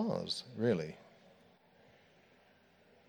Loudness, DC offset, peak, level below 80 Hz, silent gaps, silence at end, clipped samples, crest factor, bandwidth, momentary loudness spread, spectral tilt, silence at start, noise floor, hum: -37 LUFS; under 0.1%; -20 dBFS; -78 dBFS; none; 2.05 s; under 0.1%; 22 dB; over 20 kHz; 13 LU; -6 dB/octave; 0 s; -67 dBFS; none